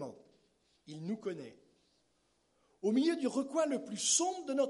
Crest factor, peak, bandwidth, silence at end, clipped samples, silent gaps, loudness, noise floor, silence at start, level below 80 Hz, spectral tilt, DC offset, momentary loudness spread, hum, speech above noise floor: 20 dB; -18 dBFS; 11.5 kHz; 0 s; under 0.1%; none; -34 LUFS; -76 dBFS; 0 s; -86 dBFS; -3 dB/octave; under 0.1%; 18 LU; none; 42 dB